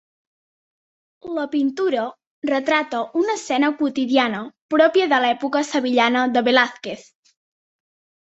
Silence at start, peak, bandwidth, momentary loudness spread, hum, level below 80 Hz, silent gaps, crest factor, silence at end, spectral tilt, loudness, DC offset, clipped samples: 1.25 s; -2 dBFS; 8.2 kHz; 13 LU; none; -68 dBFS; 2.27-2.42 s, 4.62-4.69 s; 20 dB; 1.25 s; -3.5 dB/octave; -20 LUFS; under 0.1%; under 0.1%